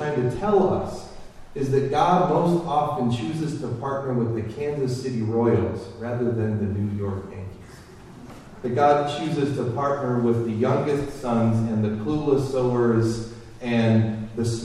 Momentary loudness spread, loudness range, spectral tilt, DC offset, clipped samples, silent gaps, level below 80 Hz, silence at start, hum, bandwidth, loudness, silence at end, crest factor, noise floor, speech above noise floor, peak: 14 LU; 3 LU; -7.5 dB/octave; under 0.1%; under 0.1%; none; -48 dBFS; 0 s; none; 12 kHz; -23 LUFS; 0 s; 16 dB; -44 dBFS; 21 dB; -6 dBFS